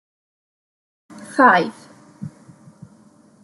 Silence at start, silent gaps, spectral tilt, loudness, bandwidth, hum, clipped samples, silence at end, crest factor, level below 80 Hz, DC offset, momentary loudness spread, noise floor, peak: 1.15 s; none; -5.5 dB/octave; -16 LUFS; 12 kHz; none; under 0.1%; 1.15 s; 22 dB; -72 dBFS; under 0.1%; 23 LU; -51 dBFS; -2 dBFS